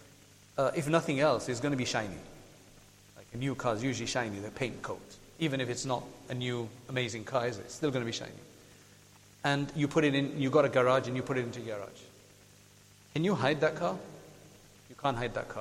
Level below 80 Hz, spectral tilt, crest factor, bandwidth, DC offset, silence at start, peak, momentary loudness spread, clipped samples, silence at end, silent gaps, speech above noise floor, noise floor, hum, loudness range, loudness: -62 dBFS; -5 dB/octave; 22 dB; 16 kHz; under 0.1%; 0 s; -12 dBFS; 14 LU; under 0.1%; 0 s; none; 27 dB; -59 dBFS; 50 Hz at -60 dBFS; 6 LU; -32 LUFS